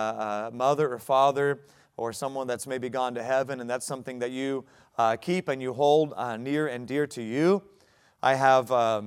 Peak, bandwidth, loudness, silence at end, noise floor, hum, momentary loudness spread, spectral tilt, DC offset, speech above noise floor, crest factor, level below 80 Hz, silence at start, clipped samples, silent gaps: -8 dBFS; 16 kHz; -27 LUFS; 0 s; -61 dBFS; none; 11 LU; -5 dB/octave; under 0.1%; 35 dB; 20 dB; -74 dBFS; 0 s; under 0.1%; none